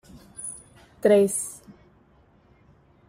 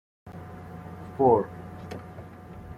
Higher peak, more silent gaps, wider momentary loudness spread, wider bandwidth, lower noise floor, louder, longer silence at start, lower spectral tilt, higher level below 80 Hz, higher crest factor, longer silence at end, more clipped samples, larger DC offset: about the same, -8 dBFS vs -8 dBFS; neither; about the same, 25 LU vs 23 LU; first, 16 kHz vs 14.5 kHz; first, -58 dBFS vs -43 dBFS; about the same, -24 LUFS vs -24 LUFS; first, 0.4 s vs 0.25 s; second, -4.5 dB/octave vs -9 dB/octave; second, -62 dBFS vs -56 dBFS; about the same, 20 dB vs 22 dB; first, 1.55 s vs 0 s; neither; neither